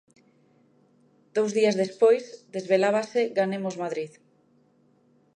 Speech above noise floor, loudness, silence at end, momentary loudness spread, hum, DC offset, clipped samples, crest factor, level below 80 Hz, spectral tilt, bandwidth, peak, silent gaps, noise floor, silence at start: 39 dB; -25 LUFS; 1.3 s; 13 LU; none; under 0.1%; under 0.1%; 18 dB; -80 dBFS; -5 dB/octave; 10 kHz; -8 dBFS; none; -63 dBFS; 1.35 s